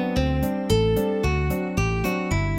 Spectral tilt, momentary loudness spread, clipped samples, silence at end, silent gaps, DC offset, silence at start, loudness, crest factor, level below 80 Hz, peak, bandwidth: -6.5 dB/octave; 4 LU; under 0.1%; 0 s; none; under 0.1%; 0 s; -23 LUFS; 14 dB; -30 dBFS; -8 dBFS; 17 kHz